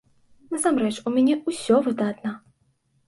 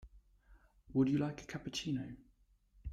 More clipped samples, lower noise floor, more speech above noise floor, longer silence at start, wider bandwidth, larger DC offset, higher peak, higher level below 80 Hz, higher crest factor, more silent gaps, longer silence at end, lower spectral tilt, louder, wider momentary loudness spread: neither; about the same, -67 dBFS vs -70 dBFS; first, 45 dB vs 34 dB; first, 0.5 s vs 0 s; about the same, 11.5 kHz vs 12.5 kHz; neither; first, -8 dBFS vs -20 dBFS; second, -68 dBFS vs -60 dBFS; about the same, 16 dB vs 20 dB; neither; first, 0.7 s vs 0 s; second, -4.5 dB/octave vs -6 dB/octave; first, -23 LUFS vs -38 LUFS; second, 12 LU vs 18 LU